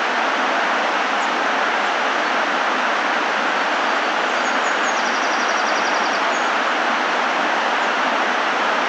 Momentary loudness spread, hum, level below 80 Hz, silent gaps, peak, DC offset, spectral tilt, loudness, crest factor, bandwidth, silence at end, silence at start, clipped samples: 1 LU; none; under -90 dBFS; none; -6 dBFS; under 0.1%; -1.5 dB/octave; -18 LUFS; 12 dB; 11.5 kHz; 0 s; 0 s; under 0.1%